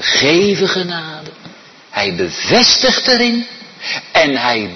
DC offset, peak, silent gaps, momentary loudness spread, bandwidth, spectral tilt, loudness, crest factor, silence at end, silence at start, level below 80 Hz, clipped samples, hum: under 0.1%; 0 dBFS; none; 16 LU; 6.4 kHz; -3 dB/octave; -13 LUFS; 14 dB; 0 s; 0 s; -50 dBFS; under 0.1%; none